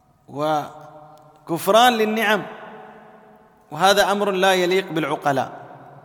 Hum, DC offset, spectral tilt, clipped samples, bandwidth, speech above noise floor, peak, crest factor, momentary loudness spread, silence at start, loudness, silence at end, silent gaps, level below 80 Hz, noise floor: none; under 0.1%; -3.5 dB/octave; under 0.1%; 19 kHz; 31 dB; -4 dBFS; 18 dB; 21 LU; 0.3 s; -19 LUFS; 0.05 s; none; -62 dBFS; -50 dBFS